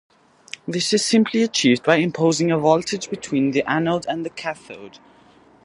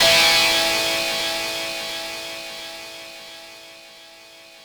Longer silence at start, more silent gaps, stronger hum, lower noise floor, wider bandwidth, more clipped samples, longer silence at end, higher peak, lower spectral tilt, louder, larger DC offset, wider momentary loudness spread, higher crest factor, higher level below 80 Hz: first, 0.65 s vs 0 s; neither; neither; first, -52 dBFS vs -45 dBFS; second, 11.5 kHz vs over 20 kHz; neither; first, 0.75 s vs 0 s; first, 0 dBFS vs -4 dBFS; first, -4.5 dB/octave vs 0 dB/octave; about the same, -20 LUFS vs -19 LUFS; neither; second, 15 LU vs 25 LU; about the same, 20 dB vs 18 dB; second, -62 dBFS vs -54 dBFS